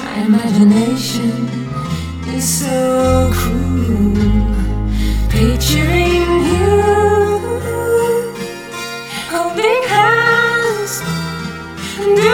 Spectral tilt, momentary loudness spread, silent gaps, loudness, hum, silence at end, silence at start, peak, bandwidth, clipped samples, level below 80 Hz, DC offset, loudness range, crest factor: -5 dB/octave; 12 LU; none; -15 LUFS; none; 0 s; 0 s; 0 dBFS; 19 kHz; under 0.1%; -24 dBFS; under 0.1%; 2 LU; 14 dB